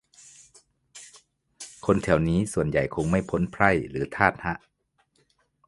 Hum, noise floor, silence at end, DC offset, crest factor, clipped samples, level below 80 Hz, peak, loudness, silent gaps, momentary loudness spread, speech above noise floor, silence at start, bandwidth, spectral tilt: none; -70 dBFS; 1.1 s; under 0.1%; 26 dB; under 0.1%; -46 dBFS; -2 dBFS; -25 LUFS; none; 21 LU; 46 dB; 0.95 s; 11.5 kHz; -6.5 dB/octave